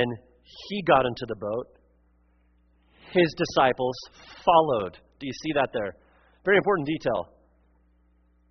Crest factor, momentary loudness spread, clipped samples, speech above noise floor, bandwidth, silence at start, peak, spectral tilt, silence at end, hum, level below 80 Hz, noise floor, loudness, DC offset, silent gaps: 22 dB; 17 LU; under 0.1%; 38 dB; 6.4 kHz; 0 s; -6 dBFS; -3.5 dB/octave; 1.25 s; none; -58 dBFS; -63 dBFS; -25 LUFS; under 0.1%; none